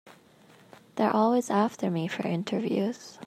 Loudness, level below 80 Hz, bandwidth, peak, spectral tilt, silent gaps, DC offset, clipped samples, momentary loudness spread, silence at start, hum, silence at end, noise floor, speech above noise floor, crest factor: -28 LUFS; -78 dBFS; 14 kHz; -10 dBFS; -6.5 dB/octave; none; under 0.1%; under 0.1%; 6 LU; 0.05 s; none; 0 s; -57 dBFS; 30 dB; 18 dB